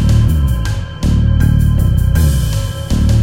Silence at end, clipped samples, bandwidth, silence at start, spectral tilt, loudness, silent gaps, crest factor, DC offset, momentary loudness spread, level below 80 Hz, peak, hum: 0 s; under 0.1%; 16.5 kHz; 0 s; -6.5 dB/octave; -14 LUFS; none; 10 dB; under 0.1%; 6 LU; -16 dBFS; 0 dBFS; none